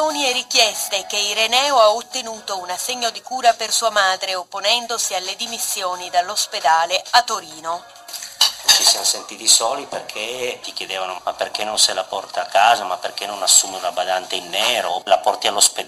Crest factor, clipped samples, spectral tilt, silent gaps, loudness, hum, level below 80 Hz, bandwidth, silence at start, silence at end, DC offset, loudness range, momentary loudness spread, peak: 20 dB; under 0.1%; 1.5 dB/octave; none; -18 LUFS; none; -64 dBFS; 15.5 kHz; 0 s; 0 s; under 0.1%; 3 LU; 13 LU; 0 dBFS